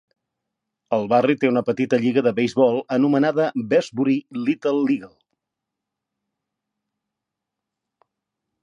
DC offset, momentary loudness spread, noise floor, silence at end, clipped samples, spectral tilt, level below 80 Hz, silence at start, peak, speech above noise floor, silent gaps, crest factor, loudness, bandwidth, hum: under 0.1%; 5 LU; -84 dBFS; 3.55 s; under 0.1%; -7 dB/octave; -70 dBFS; 0.9 s; -4 dBFS; 64 dB; none; 18 dB; -20 LUFS; 8 kHz; none